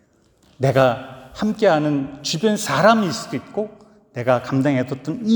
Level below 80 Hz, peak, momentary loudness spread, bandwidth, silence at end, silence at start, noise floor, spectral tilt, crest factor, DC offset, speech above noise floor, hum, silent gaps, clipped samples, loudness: -56 dBFS; 0 dBFS; 12 LU; over 20 kHz; 0 s; 0.6 s; -57 dBFS; -5.5 dB/octave; 20 dB; under 0.1%; 38 dB; none; none; under 0.1%; -20 LUFS